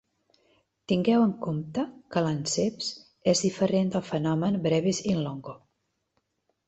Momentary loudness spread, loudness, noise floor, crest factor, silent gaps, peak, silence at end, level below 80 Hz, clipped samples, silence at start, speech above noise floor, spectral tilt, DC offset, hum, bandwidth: 9 LU; -27 LUFS; -78 dBFS; 18 dB; none; -10 dBFS; 1.1 s; -62 dBFS; under 0.1%; 0.9 s; 51 dB; -5.5 dB/octave; under 0.1%; none; 8.2 kHz